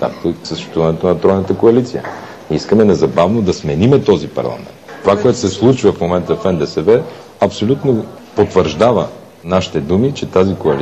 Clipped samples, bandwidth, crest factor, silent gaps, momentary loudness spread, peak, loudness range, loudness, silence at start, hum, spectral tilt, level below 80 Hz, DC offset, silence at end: under 0.1%; 9.2 kHz; 12 dB; none; 11 LU; 0 dBFS; 2 LU; -14 LUFS; 0 s; none; -7 dB/octave; -42 dBFS; 0.2%; 0 s